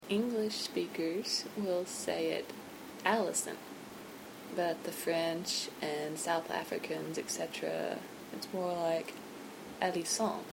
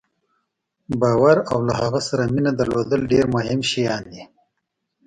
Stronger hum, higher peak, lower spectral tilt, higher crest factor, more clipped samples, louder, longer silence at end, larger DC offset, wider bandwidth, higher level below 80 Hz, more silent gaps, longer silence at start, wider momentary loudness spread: neither; second, -14 dBFS vs -4 dBFS; second, -3 dB/octave vs -6 dB/octave; about the same, 22 dB vs 18 dB; neither; second, -36 LUFS vs -20 LUFS; second, 0 s vs 0.8 s; neither; first, 16.5 kHz vs 10.5 kHz; second, -76 dBFS vs -48 dBFS; neither; second, 0 s vs 0.9 s; first, 14 LU vs 8 LU